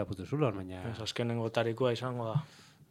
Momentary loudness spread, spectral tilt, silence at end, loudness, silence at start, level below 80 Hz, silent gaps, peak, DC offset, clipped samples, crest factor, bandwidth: 8 LU; -6.5 dB/octave; 0.05 s; -34 LUFS; 0 s; -68 dBFS; none; -14 dBFS; under 0.1%; under 0.1%; 20 dB; 13 kHz